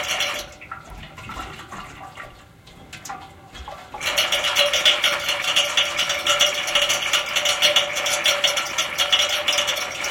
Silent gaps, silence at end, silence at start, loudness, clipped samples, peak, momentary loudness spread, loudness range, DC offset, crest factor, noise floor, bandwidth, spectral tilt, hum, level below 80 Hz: none; 0 s; 0 s; -18 LUFS; under 0.1%; -2 dBFS; 21 LU; 17 LU; under 0.1%; 20 dB; -46 dBFS; 17 kHz; 0.5 dB/octave; none; -52 dBFS